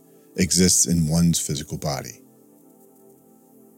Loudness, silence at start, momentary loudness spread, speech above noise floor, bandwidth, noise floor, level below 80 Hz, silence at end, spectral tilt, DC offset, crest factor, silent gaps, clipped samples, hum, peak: -20 LUFS; 0.35 s; 15 LU; 32 dB; 17 kHz; -53 dBFS; -46 dBFS; 1.65 s; -4 dB/octave; under 0.1%; 18 dB; none; under 0.1%; none; -4 dBFS